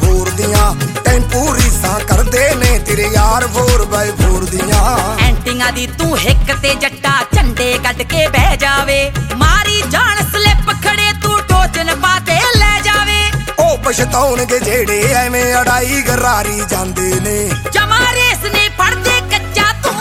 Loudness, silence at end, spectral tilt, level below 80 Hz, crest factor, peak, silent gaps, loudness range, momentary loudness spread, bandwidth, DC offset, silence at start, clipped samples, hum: -12 LUFS; 0 s; -3.5 dB/octave; -18 dBFS; 12 dB; 0 dBFS; none; 2 LU; 4 LU; 17 kHz; under 0.1%; 0 s; under 0.1%; none